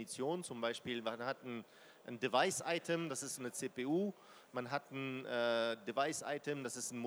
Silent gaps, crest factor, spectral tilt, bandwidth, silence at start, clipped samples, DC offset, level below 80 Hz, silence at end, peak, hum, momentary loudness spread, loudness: none; 22 dB; -3.5 dB/octave; over 20 kHz; 0 s; under 0.1%; under 0.1%; -88 dBFS; 0 s; -18 dBFS; none; 11 LU; -40 LUFS